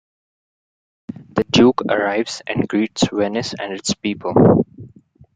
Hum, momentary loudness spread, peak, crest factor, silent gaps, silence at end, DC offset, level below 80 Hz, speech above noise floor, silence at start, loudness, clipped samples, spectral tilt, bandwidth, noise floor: none; 12 LU; -2 dBFS; 18 dB; none; 0.5 s; under 0.1%; -50 dBFS; 29 dB; 1.1 s; -18 LUFS; under 0.1%; -5.5 dB/octave; 9.4 kHz; -47 dBFS